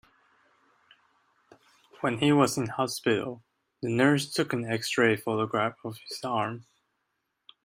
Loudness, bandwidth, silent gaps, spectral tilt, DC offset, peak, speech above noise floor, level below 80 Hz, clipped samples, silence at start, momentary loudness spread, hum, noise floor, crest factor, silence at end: -27 LUFS; 16 kHz; none; -5 dB/octave; under 0.1%; -8 dBFS; 52 dB; -70 dBFS; under 0.1%; 2 s; 14 LU; none; -79 dBFS; 22 dB; 1.05 s